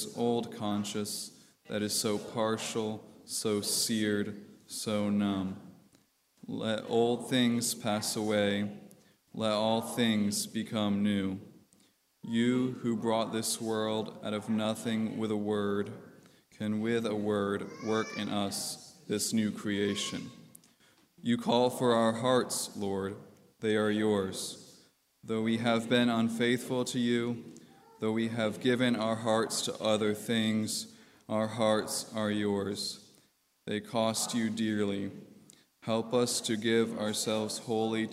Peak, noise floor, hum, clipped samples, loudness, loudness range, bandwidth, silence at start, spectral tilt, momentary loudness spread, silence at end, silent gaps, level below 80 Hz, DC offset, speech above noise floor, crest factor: -12 dBFS; -68 dBFS; none; under 0.1%; -31 LUFS; 3 LU; 16 kHz; 0 s; -4 dB/octave; 11 LU; 0 s; none; -76 dBFS; under 0.1%; 37 dB; 20 dB